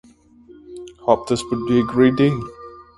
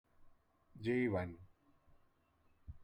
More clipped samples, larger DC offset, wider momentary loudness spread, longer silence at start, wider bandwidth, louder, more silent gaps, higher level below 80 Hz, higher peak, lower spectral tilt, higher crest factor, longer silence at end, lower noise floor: neither; neither; about the same, 23 LU vs 23 LU; first, 0.7 s vs 0.2 s; first, 11.5 kHz vs 9.6 kHz; first, -19 LUFS vs -39 LUFS; neither; first, -50 dBFS vs -68 dBFS; first, 0 dBFS vs -26 dBFS; second, -6.5 dB/octave vs -8.5 dB/octave; about the same, 20 dB vs 18 dB; first, 0.15 s vs 0 s; second, -48 dBFS vs -74 dBFS